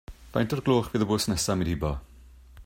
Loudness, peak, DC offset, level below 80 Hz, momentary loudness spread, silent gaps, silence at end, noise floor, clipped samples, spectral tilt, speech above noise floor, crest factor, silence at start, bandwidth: -27 LUFS; -10 dBFS; under 0.1%; -42 dBFS; 8 LU; none; 0 s; -50 dBFS; under 0.1%; -5 dB/octave; 24 dB; 18 dB; 0.1 s; 16 kHz